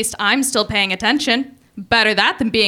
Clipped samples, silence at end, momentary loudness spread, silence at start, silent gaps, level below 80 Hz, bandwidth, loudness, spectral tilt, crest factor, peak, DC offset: under 0.1%; 0 s; 4 LU; 0 s; none; -46 dBFS; 17.5 kHz; -16 LUFS; -2.5 dB/octave; 16 dB; -2 dBFS; under 0.1%